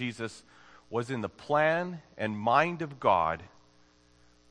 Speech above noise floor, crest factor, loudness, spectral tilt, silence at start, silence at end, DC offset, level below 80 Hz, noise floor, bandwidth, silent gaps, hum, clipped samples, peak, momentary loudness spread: 33 dB; 22 dB; -30 LUFS; -6 dB/octave; 0 s; 1.05 s; under 0.1%; -64 dBFS; -62 dBFS; 10.5 kHz; none; 60 Hz at -55 dBFS; under 0.1%; -10 dBFS; 14 LU